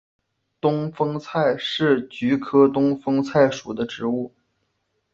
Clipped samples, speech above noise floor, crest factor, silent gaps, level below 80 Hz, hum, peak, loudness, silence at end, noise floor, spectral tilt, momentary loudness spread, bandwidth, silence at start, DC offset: under 0.1%; 52 dB; 18 dB; none; -62 dBFS; none; -4 dBFS; -21 LUFS; 0.85 s; -72 dBFS; -6.5 dB/octave; 9 LU; 7.4 kHz; 0.65 s; under 0.1%